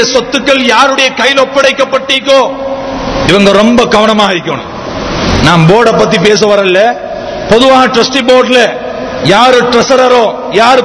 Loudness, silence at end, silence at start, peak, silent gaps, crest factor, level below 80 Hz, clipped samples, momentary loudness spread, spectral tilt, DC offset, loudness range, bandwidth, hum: -7 LUFS; 0 s; 0 s; 0 dBFS; none; 6 dB; -30 dBFS; 7%; 11 LU; -4.5 dB/octave; under 0.1%; 2 LU; 11 kHz; none